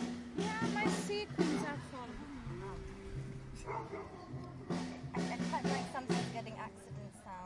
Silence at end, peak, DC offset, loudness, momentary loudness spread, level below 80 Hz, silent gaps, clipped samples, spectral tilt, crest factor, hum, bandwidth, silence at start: 0 s; -18 dBFS; under 0.1%; -40 LUFS; 12 LU; -58 dBFS; none; under 0.1%; -5.5 dB/octave; 22 dB; none; 11.5 kHz; 0 s